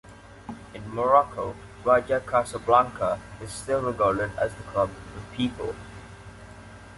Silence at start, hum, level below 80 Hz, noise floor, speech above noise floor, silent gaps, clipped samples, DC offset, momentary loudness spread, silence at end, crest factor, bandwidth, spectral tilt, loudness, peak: 0.05 s; none; -50 dBFS; -45 dBFS; 20 dB; none; under 0.1%; under 0.1%; 23 LU; 0 s; 22 dB; 11.5 kHz; -5.5 dB/octave; -25 LUFS; -6 dBFS